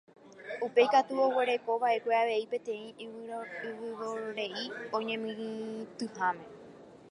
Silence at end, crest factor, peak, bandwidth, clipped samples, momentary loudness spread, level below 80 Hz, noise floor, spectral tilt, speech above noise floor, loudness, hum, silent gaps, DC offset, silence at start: 0 s; 22 dB; -12 dBFS; 10.5 kHz; under 0.1%; 16 LU; -82 dBFS; -52 dBFS; -4 dB/octave; 21 dB; -32 LUFS; none; none; under 0.1%; 0.25 s